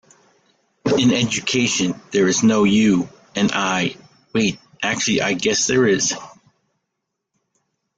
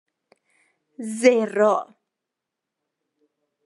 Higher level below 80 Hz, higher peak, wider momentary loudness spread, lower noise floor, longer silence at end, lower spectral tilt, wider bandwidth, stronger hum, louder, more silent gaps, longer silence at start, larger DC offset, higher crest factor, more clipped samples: first, -56 dBFS vs -90 dBFS; about the same, -4 dBFS vs -2 dBFS; second, 9 LU vs 17 LU; second, -78 dBFS vs -84 dBFS; about the same, 1.7 s vs 1.8 s; about the same, -3.5 dB/octave vs -4.5 dB/octave; second, 9.4 kHz vs 11.5 kHz; neither; about the same, -18 LUFS vs -20 LUFS; neither; second, 0.85 s vs 1 s; neither; second, 16 dB vs 22 dB; neither